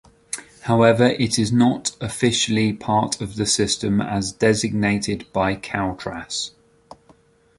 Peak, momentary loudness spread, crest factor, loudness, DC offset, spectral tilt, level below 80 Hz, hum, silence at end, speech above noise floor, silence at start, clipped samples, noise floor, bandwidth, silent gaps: -2 dBFS; 10 LU; 20 dB; -20 LUFS; under 0.1%; -4.5 dB/octave; -48 dBFS; none; 1.1 s; 35 dB; 0.35 s; under 0.1%; -55 dBFS; 11.5 kHz; none